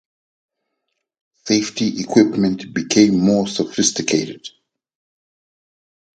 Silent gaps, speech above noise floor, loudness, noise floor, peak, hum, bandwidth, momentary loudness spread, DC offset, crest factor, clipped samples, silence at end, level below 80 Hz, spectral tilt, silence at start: none; 59 dB; -17 LUFS; -76 dBFS; 0 dBFS; none; 9.2 kHz; 14 LU; under 0.1%; 20 dB; under 0.1%; 1.65 s; -58 dBFS; -4 dB/octave; 1.45 s